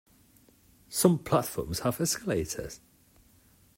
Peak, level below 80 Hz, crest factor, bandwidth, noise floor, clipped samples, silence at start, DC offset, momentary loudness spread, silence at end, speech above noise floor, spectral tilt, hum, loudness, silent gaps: -8 dBFS; -54 dBFS; 24 dB; 16.5 kHz; -62 dBFS; under 0.1%; 0.9 s; under 0.1%; 13 LU; 1 s; 33 dB; -4.5 dB/octave; none; -29 LUFS; none